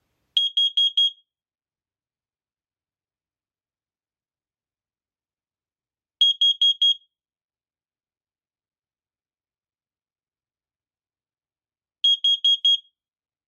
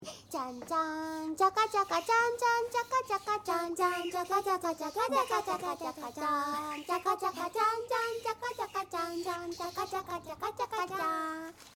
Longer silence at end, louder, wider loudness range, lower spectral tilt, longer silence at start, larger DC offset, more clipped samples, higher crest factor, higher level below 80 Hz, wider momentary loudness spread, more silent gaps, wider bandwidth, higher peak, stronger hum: first, 0.7 s vs 0.05 s; first, -18 LUFS vs -33 LUFS; about the same, 6 LU vs 5 LU; second, 6.5 dB/octave vs -3 dB/octave; first, 0.35 s vs 0 s; neither; neither; about the same, 20 dB vs 20 dB; second, under -90 dBFS vs -70 dBFS; second, 6 LU vs 9 LU; first, 7.44-7.49 s vs none; second, 10.5 kHz vs 17.5 kHz; first, -8 dBFS vs -14 dBFS; neither